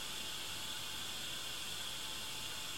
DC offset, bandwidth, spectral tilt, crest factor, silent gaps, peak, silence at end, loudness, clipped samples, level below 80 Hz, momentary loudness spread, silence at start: 0.3%; 16.5 kHz; -0.5 dB/octave; 14 dB; none; -30 dBFS; 0 s; -41 LUFS; under 0.1%; -66 dBFS; 1 LU; 0 s